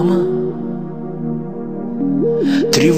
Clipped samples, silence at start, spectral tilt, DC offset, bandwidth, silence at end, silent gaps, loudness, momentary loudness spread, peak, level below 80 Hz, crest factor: under 0.1%; 0 s; -5.5 dB/octave; 2%; 15.5 kHz; 0 s; none; -19 LUFS; 11 LU; 0 dBFS; -54 dBFS; 16 dB